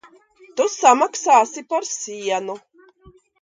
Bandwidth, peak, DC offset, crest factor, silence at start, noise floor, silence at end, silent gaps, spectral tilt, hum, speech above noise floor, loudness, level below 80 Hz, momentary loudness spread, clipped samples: 9.6 kHz; 0 dBFS; under 0.1%; 20 dB; 0.55 s; -52 dBFS; 0.85 s; none; -1.5 dB/octave; none; 33 dB; -19 LUFS; -66 dBFS; 15 LU; under 0.1%